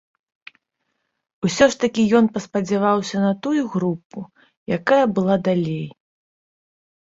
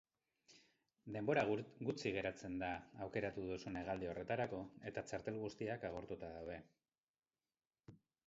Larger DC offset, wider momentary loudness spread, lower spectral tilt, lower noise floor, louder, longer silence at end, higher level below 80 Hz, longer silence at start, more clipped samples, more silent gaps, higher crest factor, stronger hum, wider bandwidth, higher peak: neither; first, 16 LU vs 11 LU; about the same, -6 dB/octave vs -5 dB/octave; second, -75 dBFS vs under -90 dBFS; first, -20 LUFS vs -45 LUFS; first, 1.15 s vs 0.3 s; first, -58 dBFS vs -70 dBFS; first, 1.4 s vs 0.5 s; neither; about the same, 4.05-4.10 s, 4.57-4.66 s vs 7.00-7.14 s; about the same, 18 dB vs 22 dB; neither; about the same, 8 kHz vs 7.6 kHz; first, -2 dBFS vs -24 dBFS